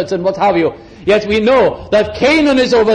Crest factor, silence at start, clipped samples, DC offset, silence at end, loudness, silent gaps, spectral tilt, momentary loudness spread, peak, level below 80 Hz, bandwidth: 10 dB; 0 s; under 0.1%; under 0.1%; 0 s; -13 LUFS; none; -5.5 dB/octave; 6 LU; -2 dBFS; -40 dBFS; 10 kHz